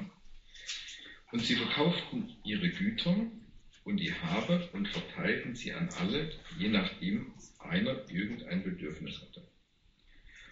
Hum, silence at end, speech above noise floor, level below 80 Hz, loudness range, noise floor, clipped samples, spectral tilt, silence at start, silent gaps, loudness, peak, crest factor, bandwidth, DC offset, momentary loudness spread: none; 0 s; 33 dB; -58 dBFS; 4 LU; -68 dBFS; under 0.1%; -4 dB/octave; 0 s; none; -34 LUFS; -16 dBFS; 18 dB; 8 kHz; under 0.1%; 16 LU